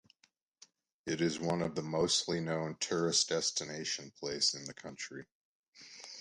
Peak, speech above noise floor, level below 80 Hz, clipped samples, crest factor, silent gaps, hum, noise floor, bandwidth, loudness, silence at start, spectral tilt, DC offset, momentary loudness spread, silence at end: -18 dBFS; 39 dB; -68 dBFS; under 0.1%; 20 dB; 5.32-5.73 s; none; -74 dBFS; 11.5 kHz; -34 LUFS; 1.05 s; -3 dB/octave; under 0.1%; 16 LU; 0 s